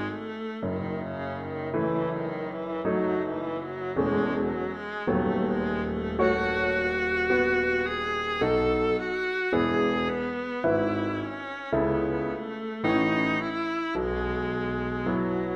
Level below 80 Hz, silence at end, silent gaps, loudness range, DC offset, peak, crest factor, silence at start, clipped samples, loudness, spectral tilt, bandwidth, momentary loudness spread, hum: -46 dBFS; 0 s; none; 4 LU; under 0.1%; -10 dBFS; 18 dB; 0 s; under 0.1%; -27 LUFS; -7.5 dB/octave; 8 kHz; 9 LU; none